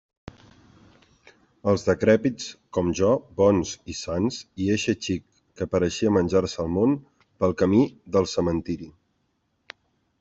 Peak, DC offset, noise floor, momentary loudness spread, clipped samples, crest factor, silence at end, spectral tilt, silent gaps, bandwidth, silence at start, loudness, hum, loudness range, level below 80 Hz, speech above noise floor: -6 dBFS; under 0.1%; -72 dBFS; 11 LU; under 0.1%; 18 dB; 1.3 s; -6 dB/octave; none; 8 kHz; 1.65 s; -24 LUFS; none; 2 LU; -54 dBFS; 49 dB